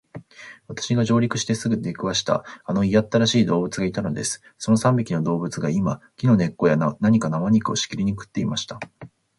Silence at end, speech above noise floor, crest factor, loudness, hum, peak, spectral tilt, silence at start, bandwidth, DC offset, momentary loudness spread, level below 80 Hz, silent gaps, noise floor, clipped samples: 0.3 s; 22 dB; 16 dB; -22 LUFS; none; -6 dBFS; -5.5 dB/octave; 0.15 s; 11.5 kHz; under 0.1%; 11 LU; -52 dBFS; none; -43 dBFS; under 0.1%